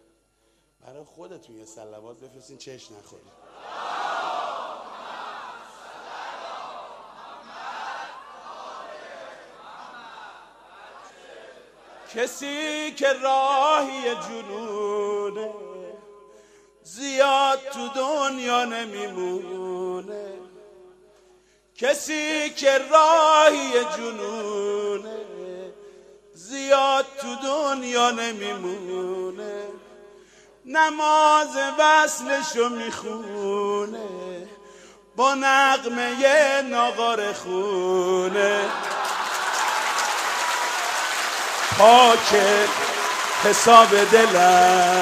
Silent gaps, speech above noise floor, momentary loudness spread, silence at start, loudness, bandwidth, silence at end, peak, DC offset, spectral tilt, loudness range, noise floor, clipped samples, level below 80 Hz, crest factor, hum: none; 45 dB; 24 LU; 0.85 s; -20 LUFS; 15.5 kHz; 0 s; 0 dBFS; under 0.1%; -2 dB/octave; 19 LU; -66 dBFS; under 0.1%; -68 dBFS; 22 dB; none